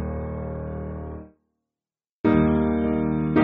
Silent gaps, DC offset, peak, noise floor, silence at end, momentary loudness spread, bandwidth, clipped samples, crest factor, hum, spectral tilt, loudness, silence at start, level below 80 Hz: 2.11-2.24 s; under 0.1%; -6 dBFS; under -90 dBFS; 0 s; 15 LU; 4.1 kHz; under 0.1%; 18 dB; none; -8 dB/octave; -24 LUFS; 0 s; -38 dBFS